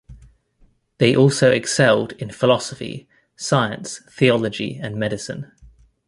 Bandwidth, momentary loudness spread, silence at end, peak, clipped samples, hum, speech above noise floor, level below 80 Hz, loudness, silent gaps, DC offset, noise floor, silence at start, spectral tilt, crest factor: 11.5 kHz; 17 LU; 0.4 s; 0 dBFS; under 0.1%; none; 39 dB; -52 dBFS; -19 LUFS; none; under 0.1%; -58 dBFS; 0.1 s; -5 dB/octave; 20 dB